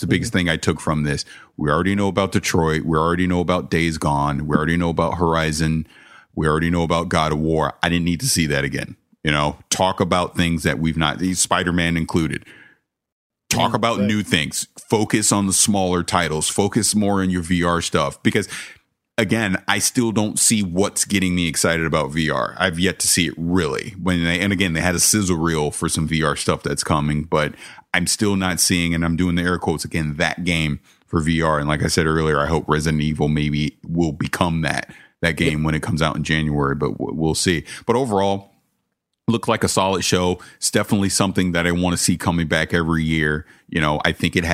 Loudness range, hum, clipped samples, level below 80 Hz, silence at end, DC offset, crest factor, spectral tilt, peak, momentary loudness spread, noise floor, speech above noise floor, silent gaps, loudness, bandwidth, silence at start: 3 LU; none; under 0.1%; -40 dBFS; 0 s; under 0.1%; 20 dB; -4 dB/octave; 0 dBFS; 6 LU; -75 dBFS; 56 dB; 13.12-13.30 s; -19 LUFS; 16 kHz; 0 s